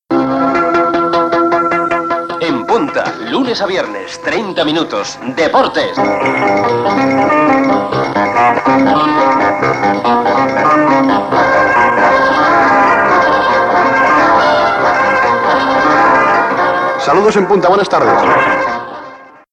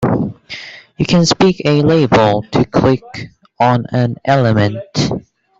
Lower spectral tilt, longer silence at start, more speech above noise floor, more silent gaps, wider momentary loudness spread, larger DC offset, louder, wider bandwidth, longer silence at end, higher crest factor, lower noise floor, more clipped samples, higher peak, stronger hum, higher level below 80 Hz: about the same, -5 dB/octave vs -6 dB/octave; about the same, 0.1 s vs 0 s; about the same, 22 dB vs 19 dB; neither; second, 7 LU vs 17 LU; neither; first, -11 LUFS vs -14 LUFS; first, 10.5 kHz vs 7.8 kHz; about the same, 0.3 s vs 0.4 s; about the same, 10 dB vs 12 dB; about the same, -34 dBFS vs -32 dBFS; neither; about the same, -2 dBFS vs -2 dBFS; neither; about the same, -46 dBFS vs -42 dBFS